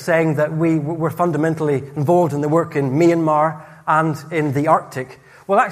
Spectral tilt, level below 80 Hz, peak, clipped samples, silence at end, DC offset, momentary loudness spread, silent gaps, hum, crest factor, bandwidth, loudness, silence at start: -7.5 dB/octave; -60 dBFS; -2 dBFS; under 0.1%; 0 s; under 0.1%; 6 LU; none; none; 16 dB; 15.5 kHz; -18 LUFS; 0 s